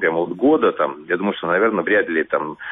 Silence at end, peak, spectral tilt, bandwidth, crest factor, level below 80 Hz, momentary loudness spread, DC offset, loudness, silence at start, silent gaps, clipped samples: 0 s; -6 dBFS; -9.5 dB/octave; 3.9 kHz; 14 dB; -60 dBFS; 6 LU; under 0.1%; -19 LUFS; 0 s; none; under 0.1%